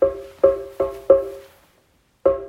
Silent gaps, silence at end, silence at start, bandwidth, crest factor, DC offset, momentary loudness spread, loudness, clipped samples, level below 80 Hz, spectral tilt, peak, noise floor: none; 0 s; 0 s; 4.9 kHz; 20 dB; under 0.1%; 12 LU; -20 LUFS; under 0.1%; -48 dBFS; -7.5 dB/octave; 0 dBFS; -61 dBFS